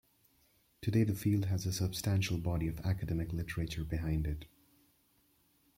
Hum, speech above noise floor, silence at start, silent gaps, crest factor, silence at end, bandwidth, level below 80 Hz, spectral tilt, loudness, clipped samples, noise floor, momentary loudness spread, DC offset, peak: none; 38 dB; 0.8 s; none; 16 dB; 1.3 s; 16.5 kHz; -50 dBFS; -6 dB/octave; -35 LUFS; under 0.1%; -72 dBFS; 7 LU; under 0.1%; -18 dBFS